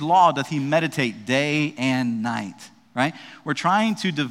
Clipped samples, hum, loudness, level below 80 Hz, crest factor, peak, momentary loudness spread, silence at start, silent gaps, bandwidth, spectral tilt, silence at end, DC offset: under 0.1%; none; -22 LUFS; -70 dBFS; 18 dB; -4 dBFS; 10 LU; 0 s; none; 15 kHz; -5 dB/octave; 0 s; under 0.1%